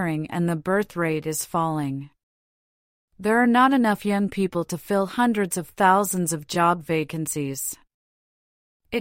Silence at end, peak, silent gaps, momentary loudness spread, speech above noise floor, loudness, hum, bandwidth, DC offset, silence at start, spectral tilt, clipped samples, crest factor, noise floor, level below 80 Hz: 0 s; -6 dBFS; 2.23-3.08 s, 7.94-8.80 s; 10 LU; over 67 dB; -23 LUFS; none; 16.5 kHz; under 0.1%; 0 s; -5 dB/octave; under 0.1%; 18 dB; under -90 dBFS; -60 dBFS